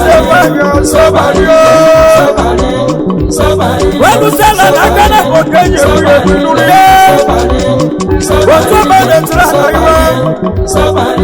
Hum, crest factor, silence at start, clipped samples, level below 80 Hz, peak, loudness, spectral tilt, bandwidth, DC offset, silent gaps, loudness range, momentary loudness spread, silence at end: none; 6 dB; 0 s; 4%; -20 dBFS; 0 dBFS; -6 LUFS; -5 dB/octave; over 20 kHz; under 0.1%; none; 2 LU; 7 LU; 0 s